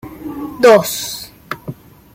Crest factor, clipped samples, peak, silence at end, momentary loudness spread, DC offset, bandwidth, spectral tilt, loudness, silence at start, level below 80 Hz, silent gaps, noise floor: 16 dB; under 0.1%; 0 dBFS; 0.4 s; 19 LU; under 0.1%; 16.5 kHz; -3.5 dB/octave; -13 LUFS; 0.05 s; -50 dBFS; none; -33 dBFS